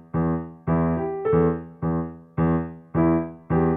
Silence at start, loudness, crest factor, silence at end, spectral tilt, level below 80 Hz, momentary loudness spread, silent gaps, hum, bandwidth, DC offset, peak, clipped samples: 0.15 s; -24 LUFS; 14 dB; 0 s; -13.5 dB/octave; -42 dBFS; 7 LU; none; none; 3 kHz; under 0.1%; -8 dBFS; under 0.1%